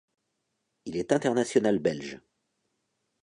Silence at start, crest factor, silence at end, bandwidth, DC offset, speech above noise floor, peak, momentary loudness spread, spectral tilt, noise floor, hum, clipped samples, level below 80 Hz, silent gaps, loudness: 0.85 s; 22 dB; 1.05 s; 11 kHz; under 0.1%; 53 dB; -10 dBFS; 18 LU; -5.5 dB/octave; -80 dBFS; none; under 0.1%; -66 dBFS; none; -27 LUFS